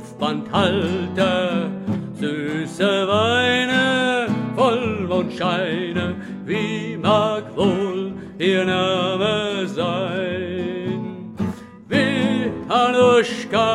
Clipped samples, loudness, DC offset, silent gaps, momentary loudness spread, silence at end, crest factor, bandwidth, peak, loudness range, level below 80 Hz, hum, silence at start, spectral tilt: under 0.1%; -20 LUFS; under 0.1%; none; 9 LU; 0 s; 18 dB; 12 kHz; -4 dBFS; 4 LU; -56 dBFS; none; 0 s; -5.5 dB/octave